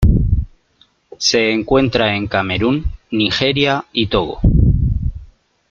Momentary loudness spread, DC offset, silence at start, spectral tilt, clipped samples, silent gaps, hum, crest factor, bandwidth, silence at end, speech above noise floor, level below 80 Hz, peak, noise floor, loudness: 8 LU; under 0.1%; 0 s; -5.5 dB/octave; under 0.1%; none; none; 14 dB; 7.6 kHz; 0.45 s; 40 dB; -22 dBFS; -2 dBFS; -56 dBFS; -16 LUFS